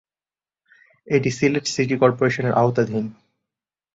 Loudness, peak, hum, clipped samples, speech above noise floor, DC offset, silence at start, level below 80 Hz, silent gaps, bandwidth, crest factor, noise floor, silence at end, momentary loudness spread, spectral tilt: -20 LUFS; -2 dBFS; none; under 0.1%; over 70 dB; under 0.1%; 1.1 s; -58 dBFS; none; 7.8 kHz; 20 dB; under -90 dBFS; 0.85 s; 6 LU; -6 dB/octave